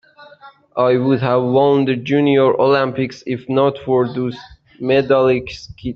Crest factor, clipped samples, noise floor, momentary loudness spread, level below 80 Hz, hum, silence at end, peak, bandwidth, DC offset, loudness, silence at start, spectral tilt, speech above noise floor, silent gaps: 14 dB; under 0.1%; -44 dBFS; 12 LU; -50 dBFS; none; 0 s; -2 dBFS; 6.8 kHz; under 0.1%; -16 LUFS; 0.2 s; -7.5 dB/octave; 28 dB; none